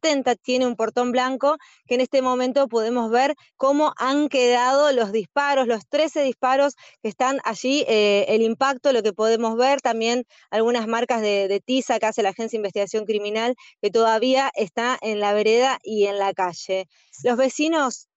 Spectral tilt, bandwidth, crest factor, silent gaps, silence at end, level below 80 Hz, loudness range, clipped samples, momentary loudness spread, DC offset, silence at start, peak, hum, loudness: -3 dB/octave; 8.2 kHz; 12 dB; none; 0.2 s; -72 dBFS; 2 LU; under 0.1%; 6 LU; under 0.1%; 0.05 s; -10 dBFS; none; -21 LUFS